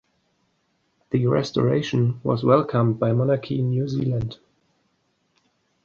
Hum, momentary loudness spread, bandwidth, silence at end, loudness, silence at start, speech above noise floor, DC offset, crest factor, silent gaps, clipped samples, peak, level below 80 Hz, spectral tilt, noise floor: none; 6 LU; 7 kHz; 1.5 s; -22 LUFS; 1.1 s; 48 dB; under 0.1%; 20 dB; none; under 0.1%; -4 dBFS; -54 dBFS; -8 dB/octave; -69 dBFS